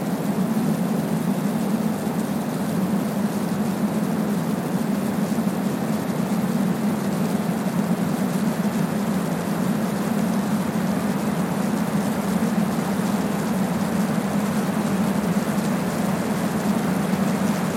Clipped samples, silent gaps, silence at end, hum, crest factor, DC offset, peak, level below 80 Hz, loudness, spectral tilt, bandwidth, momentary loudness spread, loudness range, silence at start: under 0.1%; none; 0 s; none; 12 dB; under 0.1%; -10 dBFS; -54 dBFS; -23 LUFS; -6.5 dB/octave; 16.5 kHz; 2 LU; 1 LU; 0 s